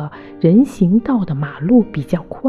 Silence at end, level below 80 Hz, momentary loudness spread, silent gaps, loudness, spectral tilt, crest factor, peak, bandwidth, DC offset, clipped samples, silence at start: 0 s; -44 dBFS; 9 LU; none; -15 LUFS; -9.5 dB/octave; 14 dB; -2 dBFS; 11.5 kHz; under 0.1%; under 0.1%; 0 s